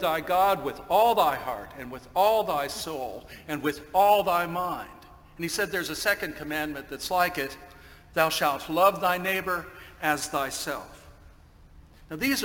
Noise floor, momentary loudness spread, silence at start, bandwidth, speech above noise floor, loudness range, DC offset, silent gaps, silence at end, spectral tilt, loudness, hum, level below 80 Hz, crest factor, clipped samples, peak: -52 dBFS; 15 LU; 0 s; 17 kHz; 26 dB; 3 LU; under 0.1%; none; 0 s; -3.5 dB/octave; -26 LUFS; none; -54 dBFS; 22 dB; under 0.1%; -6 dBFS